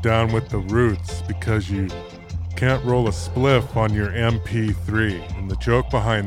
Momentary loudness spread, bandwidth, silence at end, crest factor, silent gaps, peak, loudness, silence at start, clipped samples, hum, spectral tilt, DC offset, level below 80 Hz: 10 LU; 12.5 kHz; 0 s; 16 dB; none; -4 dBFS; -22 LUFS; 0 s; under 0.1%; none; -7 dB/octave; under 0.1%; -34 dBFS